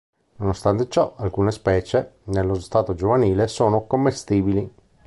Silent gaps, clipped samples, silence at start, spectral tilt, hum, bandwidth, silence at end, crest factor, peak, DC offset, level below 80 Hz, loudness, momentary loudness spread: none; under 0.1%; 0.4 s; -7 dB/octave; none; 11.5 kHz; 0.35 s; 16 dB; -4 dBFS; under 0.1%; -40 dBFS; -21 LUFS; 6 LU